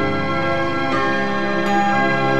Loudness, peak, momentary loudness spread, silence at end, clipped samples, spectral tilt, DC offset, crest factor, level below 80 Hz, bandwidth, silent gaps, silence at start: -19 LUFS; -6 dBFS; 3 LU; 0 s; under 0.1%; -6 dB/octave; 5%; 12 dB; -50 dBFS; 12 kHz; none; 0 s